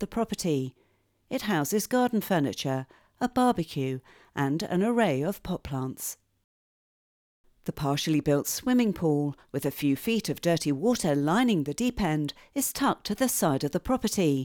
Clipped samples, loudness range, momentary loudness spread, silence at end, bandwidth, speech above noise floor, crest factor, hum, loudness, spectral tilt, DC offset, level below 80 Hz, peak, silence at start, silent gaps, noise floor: under 0.1%; 4 LU; 9 LU; 0 s; over 20 kHz; over 63 dB; 18 dB; none; -28 LUFS; -5 dB/octave; under 0.1%; -54 dBFS; -10 dBFS; 0 s; 6.44-7.44 s; under -90 dBFS